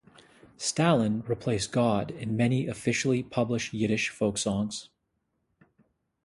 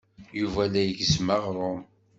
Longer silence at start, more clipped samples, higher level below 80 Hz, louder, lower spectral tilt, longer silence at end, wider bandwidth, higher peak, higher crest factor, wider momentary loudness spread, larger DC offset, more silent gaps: first, 0.6 s vs 0.2 s; neither; second, -58 dBFS vs -50 dBFS; about the same, -28 LUFS vs -26 LUFS; about the same, -5 dB/octave vs -5 dB/octave; first, 1.4 s vs 0.35 s; first, 11.5 kHz vs 8 kHz; about the same, -8 dBFS vs -8 dBFS; about the same, 20 dB vs 18 dB; second, 7 LU vs 10 LU; neither; neither